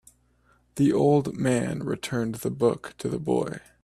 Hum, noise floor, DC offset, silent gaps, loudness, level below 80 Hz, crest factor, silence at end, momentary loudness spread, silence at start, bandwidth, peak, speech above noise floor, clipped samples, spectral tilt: none; -64 dBFS; under 0.1%; none; -26 LUFS; -58 dBFS; 18 dB; 0.25 s; 10 LU; 0.75 s; 14 kHz; -8 dBFS; 38 dB; under 0.1%; -6.5 dB/octave